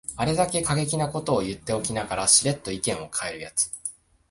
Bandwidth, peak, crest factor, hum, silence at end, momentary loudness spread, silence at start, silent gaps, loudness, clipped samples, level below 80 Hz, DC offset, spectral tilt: 12 kHz; -4 dBFS; 22 dB; none; 0.4 s; 11 LU; 0.1 s; none; -24 LUFS; under 0.1%; -50 dBFS; under 0.1%; -3 dB/octave